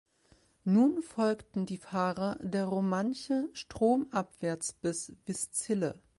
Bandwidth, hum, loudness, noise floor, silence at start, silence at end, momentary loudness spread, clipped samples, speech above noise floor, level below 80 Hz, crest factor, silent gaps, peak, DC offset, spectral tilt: 11.5 kHz; none; -32 LUFS; -66 dBFS; 0.65 s; 0.25 s; 9 LU; under 0.1%; 35 dB; -66 dBFS; 16 dB; none; -16 dBFS; under 0.1%; -5.5 dB/octave